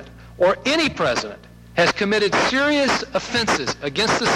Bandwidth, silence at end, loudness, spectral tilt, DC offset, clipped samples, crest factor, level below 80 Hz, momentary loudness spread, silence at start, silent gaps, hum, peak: 14 kHz; 0 s; -19 LUFS; -3.5 dB/octave; under 0.1%; under 0.1%; 14 dB; -48 dBFS; 5 LU; 0 s; none; none; -6 dBFS